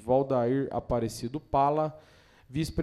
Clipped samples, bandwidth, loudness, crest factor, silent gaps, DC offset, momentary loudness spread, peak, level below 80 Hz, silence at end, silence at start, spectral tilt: under 0.1%; 14.5 kHz; -29 LUFS; 16 dB; none; under 0.1%; 9 LU; -12 dBFS; -50 dBFS; 0 s; 0 s; -7 dB/octave